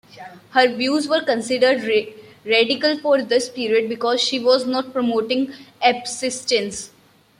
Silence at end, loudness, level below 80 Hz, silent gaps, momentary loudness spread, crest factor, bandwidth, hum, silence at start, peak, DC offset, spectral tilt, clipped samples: 0.55 s; -19 LUFS; -66 dBFS; none; 11 LU; 18 dB; 13 kHz; none; 0.15 s; -2 dBFS; under 0.1%; -2.5 dB/octave; under 0.1%